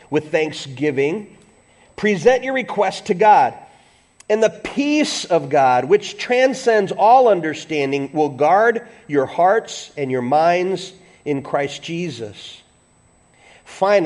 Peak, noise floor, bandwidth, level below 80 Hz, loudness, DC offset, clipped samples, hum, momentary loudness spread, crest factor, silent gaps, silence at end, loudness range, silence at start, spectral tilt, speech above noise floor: -2 dBFS; -55 dBFS; 11.5 kHz; -60 dBFS; -18 LUFS; under 0.1%; under 0.1%; none; 13 LU; 16 dB; none; 0 s; 6 LU; 0.1 s; -5 dB/octave; 38 dB